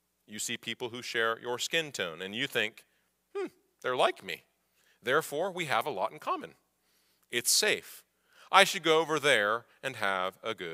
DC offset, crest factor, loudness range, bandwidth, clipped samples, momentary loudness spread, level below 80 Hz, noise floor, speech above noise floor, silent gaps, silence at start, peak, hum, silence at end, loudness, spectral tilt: under 0.1%; 28 dB; 7 LU; 16 kHz; under 0.1%; 15 LU; -82 dBFS; -72 dBFS; 41 dB; none; 0.3 s; -4 dBFS; none; 0 s; -30 LUFS; -1.5 dB/octave